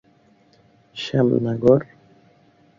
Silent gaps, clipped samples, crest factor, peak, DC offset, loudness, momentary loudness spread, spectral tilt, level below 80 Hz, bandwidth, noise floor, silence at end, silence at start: none; under 0.1%; 22 dB; -2 dBFS; under 0.1%; -20 LUFS; 20 LU; -8 dB/octave; -56 dBFS; 7.4 kHz; -57 dBFS; 0.95 s; 0.95 s